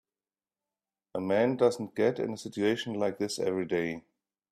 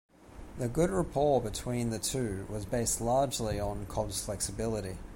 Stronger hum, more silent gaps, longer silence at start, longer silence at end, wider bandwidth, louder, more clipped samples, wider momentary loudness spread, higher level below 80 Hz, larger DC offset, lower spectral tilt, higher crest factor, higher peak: neither; neither; first, 1.15 s vs 0.2 s; first, 0.5 s vs 0 s; second, 13.5 kHz vs 16.5 kHz; about the same, -30 LUFS vs -32 LUFS; neither; about the same, 9 LU vs 8 LU; second, -72 dBFS vs -46 dBFS; neither; about the same, -5.5 dB/octave vs -5 dB/octave; about the same, 18 dB vs 16 dB; first, -12 dBFS vs -16 dBFS